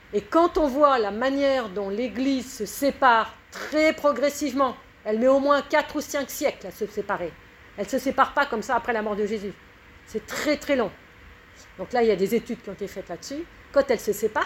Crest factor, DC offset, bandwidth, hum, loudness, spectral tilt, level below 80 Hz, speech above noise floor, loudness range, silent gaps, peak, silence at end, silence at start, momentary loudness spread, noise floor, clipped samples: 20 dB; under 0.1%; 16.5 kHz; none; -24 LUFS; -4 dB/octave; -52 dBFS; 25 dB; 5 LU; none; -4 dBFS; 0 s; 0.1 s; 15 LU; -49 dBFS; under 0.1%